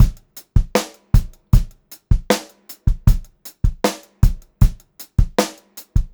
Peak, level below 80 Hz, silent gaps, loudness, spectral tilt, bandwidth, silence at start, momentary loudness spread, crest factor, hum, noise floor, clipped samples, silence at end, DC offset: 0 dBFS; -20 dBFS; none; -21 LUFS; -6 dB/octave; over 20 kHz; 0 s; 10 LU; 18 dB; none; -39 dBFS; under 0.1%; 0.1 s; under 0.1%